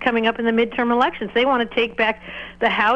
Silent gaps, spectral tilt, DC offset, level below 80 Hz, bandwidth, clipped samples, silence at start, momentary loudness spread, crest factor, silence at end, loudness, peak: none; -5.5 dB/octave; under 0.1%; -50 dBFS; 8 kHz; under 0.1%; 0 s; 4 LU; 18 dB; 0 s; -20 LUFS; -2 dBFS